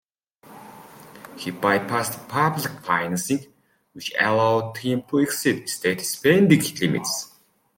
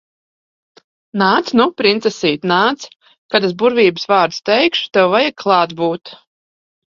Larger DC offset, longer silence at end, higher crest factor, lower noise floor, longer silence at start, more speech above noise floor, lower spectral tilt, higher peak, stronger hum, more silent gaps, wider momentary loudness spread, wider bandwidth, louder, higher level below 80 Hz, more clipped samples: neither; second, 0.5 s vs 0.75 s; about the same, 20 dB vs 16 dB; second, -52 dBFS vs under -90 dBFS; second, 0.5 s vs 1.15 s; second, 30 dB vs over 75 dB; about the same, -4.5 dB/octave vs -5 dB/octave; about the same, -2 dBFS vs 0 dBFS; neither; second, none vs 3.18-3.29 s; first, 15 LU vs 7 LU; first, 17 kHz vs 7.6 kHz; second, -22 LUFS vs -14 LUFS; about the same, -64 dBFS vs -60 dBFS; neither